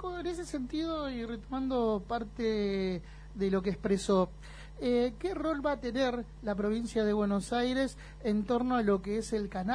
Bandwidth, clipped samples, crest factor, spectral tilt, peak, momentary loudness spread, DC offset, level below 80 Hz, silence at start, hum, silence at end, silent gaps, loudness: 10.5 kHz; under 0.1%; 16 dB; -6 dB/octave; -16 dBFS; 8 LU; under 0.1%; -48 dBFS; 0 s; none; 0 s; none; -32 LUFS